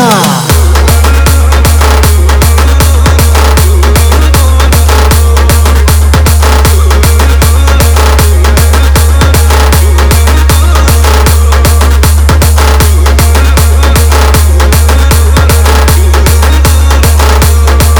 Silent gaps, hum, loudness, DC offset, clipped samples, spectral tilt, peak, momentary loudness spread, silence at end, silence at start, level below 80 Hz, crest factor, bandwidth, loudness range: none; none; -5 LUFS; under 0.1%; 10%; -4.5 dB/octave; 0 dBFS; 0 LU; 0 s; 0 s; -6 dBFS; 4 dB; over 20 kHz; 0 LU